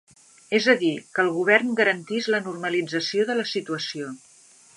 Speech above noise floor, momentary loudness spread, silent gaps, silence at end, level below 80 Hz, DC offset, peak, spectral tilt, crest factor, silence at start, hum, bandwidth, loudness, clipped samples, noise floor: 30 dB; 10 LU; none; 0.6 s; -78 dBFS; under 0.1%; -4 dBFS; -4 dB/octave; 22 dB; 0.5 s; none; 11.5 kHz; -23 LUFS; under 0.1%; -53 dBFS